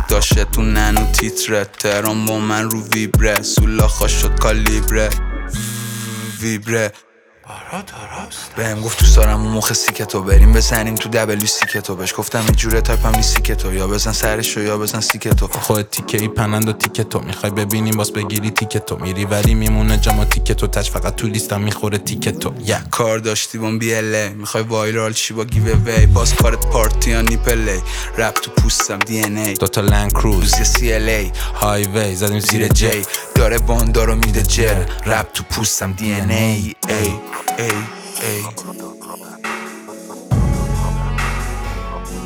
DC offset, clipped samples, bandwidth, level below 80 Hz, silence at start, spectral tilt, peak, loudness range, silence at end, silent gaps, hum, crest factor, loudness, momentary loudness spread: under 0.1%; under 0.1%; 19 kHz; -20 dBFS; 0 s; -4 dB/octave; 0 dBFS; 7 LU; 0 s; none; none; 14 dB; -17 LUFS; 9 LU